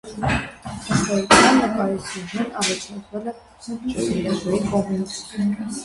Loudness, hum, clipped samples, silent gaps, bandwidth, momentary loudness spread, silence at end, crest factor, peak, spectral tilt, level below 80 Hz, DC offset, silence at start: -21 LUFS; none; under 0.1%; none; 11.5 kHz; 17 LU; 0 s; 22 dB; 0 dBFS; -4 dB/octave; -44 dBFS; under 0.1%; 0.05 s